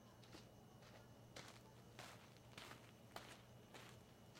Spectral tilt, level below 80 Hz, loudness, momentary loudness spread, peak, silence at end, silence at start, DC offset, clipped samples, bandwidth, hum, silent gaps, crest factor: -4 dB/octave; -80 dBFS; -61 LUFS; 5 LU; -36 dBFS; 0 s; 0 s; under 0.1%; under 0.1%; 16 kHz; none; none; 26 dB